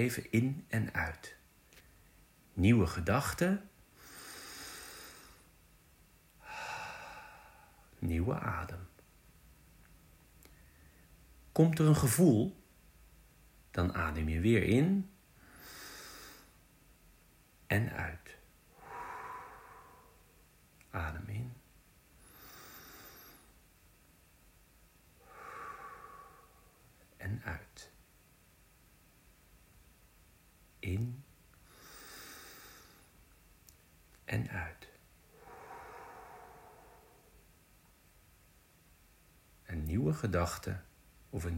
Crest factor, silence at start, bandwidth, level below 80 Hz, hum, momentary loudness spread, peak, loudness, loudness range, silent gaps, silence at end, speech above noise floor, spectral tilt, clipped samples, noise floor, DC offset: 24 dB; 0 s; 16 kHz; -54 dBFS; none; 27 LU; -14 dBFS; -35 LUFS; 21 LU; none; 0 s; 33 dB; -6 dB/octave; under 0.1%; -65 dBFS; under 0.1%